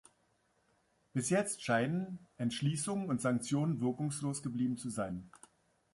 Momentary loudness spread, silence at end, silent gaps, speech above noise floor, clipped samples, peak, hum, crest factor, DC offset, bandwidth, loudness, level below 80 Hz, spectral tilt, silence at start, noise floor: 7 LU; 0.65 s; none; 40 dB; under 0.1%; -18 dBFS; none; 18 dB; under 0.1%; 11.5 kHz; -36 LUFS; -70 dBFS; -5.5 dB/octave; 1.15 s; -75 dBFS